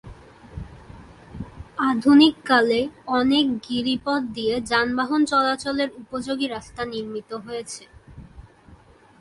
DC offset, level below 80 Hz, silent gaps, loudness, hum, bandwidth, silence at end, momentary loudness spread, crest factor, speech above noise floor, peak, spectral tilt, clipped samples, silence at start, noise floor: under 0.1%; -50 dBFS; none; -22 LUFS; none; 11.5 kHz; 0.45 s; 22 LU; 18 dB; 29 dB; -4 dBFS; -4.5 dB/octave; under 0.1%; 0.05 s; -51 dBFS